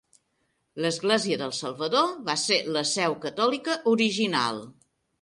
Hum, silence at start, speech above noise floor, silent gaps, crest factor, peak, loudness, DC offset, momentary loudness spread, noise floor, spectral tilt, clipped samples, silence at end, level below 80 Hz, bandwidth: none; 0.75 s; 48 dB; none; 18 dB; -8 dBFS; -25 LUFS; under 0.1%; 7 LU; -74 dBFS; -3 dB/octave; under 0.1%; 0.5 s; -72 dBFS; 11.5 kHz